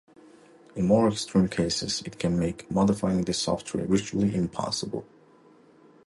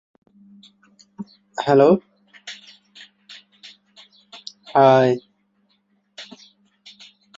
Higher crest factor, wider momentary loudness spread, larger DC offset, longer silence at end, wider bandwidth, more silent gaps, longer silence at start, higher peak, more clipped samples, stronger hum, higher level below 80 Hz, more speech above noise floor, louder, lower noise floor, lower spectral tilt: about the same, 18 dB vs 20 dB; second, 7 LU vs 27 LU; neither; about the same, 1.05 s vs 1.15 s; first, 11.5 kHz vs 7.8 kHz; neither; second, 0.75 s vs 1.2 s; second, -8 dBFS vs -2 dBFS; neither; neither; first, -50 dBFS vs -68 dBFS; second, 30 dB vs 49 dB; second, -26 LUFS vs -17 LUFS; second, -56 dBFS vs -66 dBFS; about the same, -5.5 dB/octave vs -6.5 dB/octave